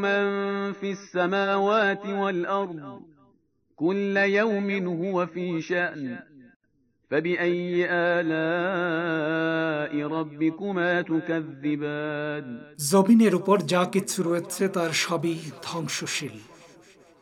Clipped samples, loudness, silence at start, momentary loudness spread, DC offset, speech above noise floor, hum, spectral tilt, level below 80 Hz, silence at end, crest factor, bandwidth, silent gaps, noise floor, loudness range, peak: under 0.1%; -25 LUFS; 0 s; 9 LU; under 0.1%; 44 dB; none; -5 dB/octave; -76 dBFS; 0.55 s; 18 dB; 16 kHz; 6.56-6.60 s; -69 dBFS; 4 LU; -8 dBFS